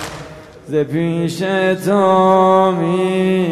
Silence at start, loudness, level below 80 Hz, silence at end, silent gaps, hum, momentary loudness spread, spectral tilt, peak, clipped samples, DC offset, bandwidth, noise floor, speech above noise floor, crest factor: 0 s; -15 LUFS; -52 dBFS; 0 s; none; none; 11 LU; -6.5 dB/octave; -2 dBFS; under 0.1%; under 0.1%; 13.5 kHz; -35 dBFS; 21 dB; 12 dB